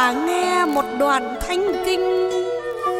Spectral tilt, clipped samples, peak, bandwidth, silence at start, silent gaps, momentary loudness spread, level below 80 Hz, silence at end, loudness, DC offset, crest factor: -3 dB/octave; under 0.1%; -4 dBFS; 17 kHz; 0 s; none; 5 LU; -44 dBFS; 0 s; -20 LUFS; under 0.1%; 16 dB